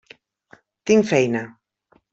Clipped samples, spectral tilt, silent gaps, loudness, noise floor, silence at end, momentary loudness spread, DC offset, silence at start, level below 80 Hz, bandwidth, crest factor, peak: under 0.1%; -5.5 dB/octave; none; -19 LUFS; -62 dBFS; 0.6 s; 17 LU; under 0.1%; 0.85 s; -64 dBFS; 8 kHz; 20 dB; -4 dBFS